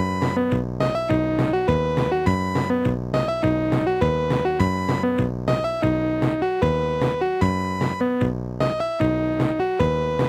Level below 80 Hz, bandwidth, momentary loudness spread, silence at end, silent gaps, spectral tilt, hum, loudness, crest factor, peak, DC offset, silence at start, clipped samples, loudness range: -38 dBFS; 14 kHz; 3 LU; 0 s; none; -7.5 dB/octave; none; -22 LUFS; 14 dB; -6 dBFS; under 0.1%; 0 s; under 0.1%; 1 LU